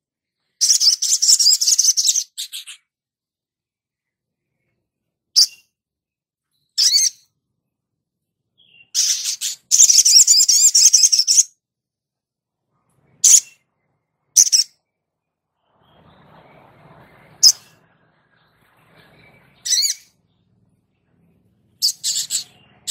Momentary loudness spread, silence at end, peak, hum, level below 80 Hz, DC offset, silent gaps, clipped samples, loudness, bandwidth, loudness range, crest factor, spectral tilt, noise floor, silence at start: 16 LU; 0 s; 0 dBFS; none; -76 dBFS; under 0.1%; none; under 0.1%; -12 LUFS; 16.5 kHz; 13 LU; 20 dB; 5 dB/octave; -89 dBFS; 0.6 s